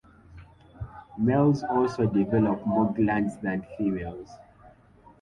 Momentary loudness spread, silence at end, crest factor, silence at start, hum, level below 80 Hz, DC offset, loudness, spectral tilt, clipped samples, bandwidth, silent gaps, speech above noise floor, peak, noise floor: 19 LU; 0.5 s; 16 dB; 0.3 s; none; -52 dBFS; under 0.1%; -26 LUFS; -9 dB/octave; under 0.1%; 9.6 kHz; none; 30 dB; -10 dBFS; -55 dBFS